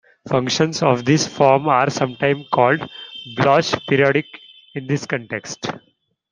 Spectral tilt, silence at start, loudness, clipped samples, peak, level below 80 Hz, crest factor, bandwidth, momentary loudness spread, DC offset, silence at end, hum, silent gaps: -5 dB/octave; 0.25 s; -18 LUFS; under 0.1%; 0 dBFS; -58 dBFS; 18 dB; 10 kHz; 15 LU; under 0.1%; 0.55 s; none; none